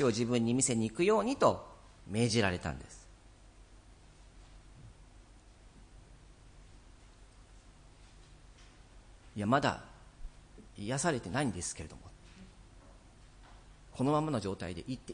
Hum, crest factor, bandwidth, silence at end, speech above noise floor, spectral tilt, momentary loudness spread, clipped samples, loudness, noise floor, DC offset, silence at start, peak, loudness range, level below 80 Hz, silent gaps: none; 24 dB; 10.5 kHz; 0 s; 25 dB; -4.5 dB/octave; 26 LU; under 0.1%; -33 LUFS; -57 dBFS; under 0.1%; 0 s; -12 dBFS; 8 LU; -56 dBFS; none